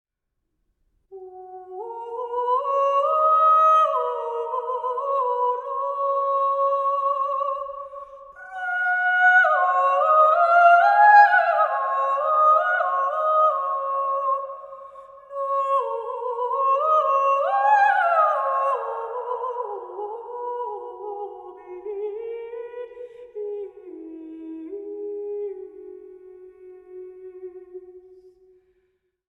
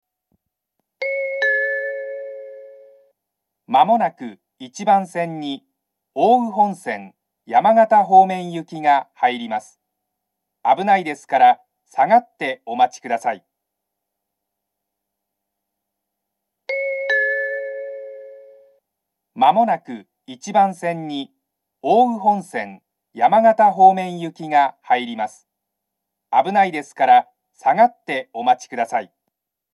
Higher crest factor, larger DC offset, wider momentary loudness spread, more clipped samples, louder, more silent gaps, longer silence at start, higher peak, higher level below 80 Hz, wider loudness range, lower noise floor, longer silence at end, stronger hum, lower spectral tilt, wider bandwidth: about the same, 20 dB vs 20 dB; neither; first, 23 LU vs 17 LU; neither; about the same, -20 LUFS vs -18 LUFS; neither; about the same, 1.1 s vs 1 s; about the same, -2 dBFS vs 0 dBFS; first, -72 dBFS vs -84 dBFS; first, 18 LU vs 8 LU; about the same, -78 dBFS vs -80 dBFS; first, 1.3 s vs 0.7 s; neither; second, -2.5 dB/octave vs -5 dB/octave; second, 8.8 kHz vs 12 kHz